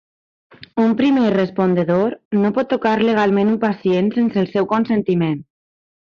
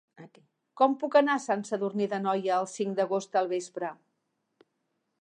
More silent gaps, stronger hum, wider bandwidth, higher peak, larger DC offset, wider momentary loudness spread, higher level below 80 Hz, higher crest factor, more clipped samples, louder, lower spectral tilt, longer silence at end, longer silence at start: first, 2.25-2.31 s vs none; neither; second, 6.8 kHz vs 9.8 kHz; first, -4 dBFS vs -10 dBFS; neither; second, 4 LU vs 9 LU; first, -58 dBFS vs -86 dBFS; second, 14 dB vs 20 dB; neither; first, -17 LUFS vs -28 LUFS; first, -8.5 dB/octave vs -5 dB/octave; second, 0.75 s vs 1.25 s; first, 0.75 s vs 0.2 s